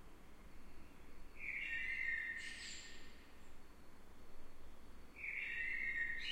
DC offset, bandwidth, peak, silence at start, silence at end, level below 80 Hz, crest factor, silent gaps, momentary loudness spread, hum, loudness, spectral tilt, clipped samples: under 0.1%; 15.5 kHz; -30 dBFS; 0 s; 0 s; -58 dBFS; 16 dB; none; 23 LU; none; -43 LUFS; -1.5 dB/octave; under 0.1%